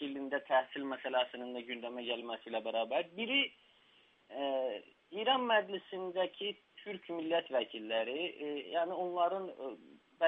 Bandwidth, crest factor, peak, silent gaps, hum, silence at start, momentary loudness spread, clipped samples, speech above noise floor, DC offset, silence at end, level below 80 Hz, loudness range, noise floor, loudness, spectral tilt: 4 kHz; 20 dB; -16 dBFS; none; none; 0 s; 12 LU; under 0.1%; 31 dB; under 0.1%; 0 s; -90 dBFS; 2 LU; -68 dBFS; -36 LUFS; -6 dB/octave